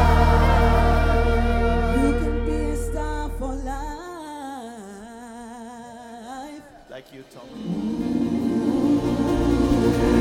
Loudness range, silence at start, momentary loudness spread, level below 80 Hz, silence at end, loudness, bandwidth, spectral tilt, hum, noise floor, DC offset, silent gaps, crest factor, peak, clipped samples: 16 LU; 0 s; 21 LU; -26 dBFS; 0 s; -22 LUFS; 15.5 kHz; -7 dB/octave; none; -42 dBFS; under 0.1%; none; 16 dB; -4 dBFS; under 0.1%